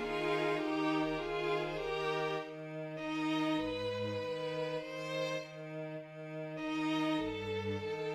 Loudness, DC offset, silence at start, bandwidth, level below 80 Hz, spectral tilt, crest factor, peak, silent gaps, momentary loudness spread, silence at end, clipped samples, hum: -37 LUFS; under 0.1%; 0 s; 12.5 kHz; -64 dBFS; -5.5 dB/octave; 16 dB; -22 dBFS; none; 10 LU; 0 s; under 0.1%; none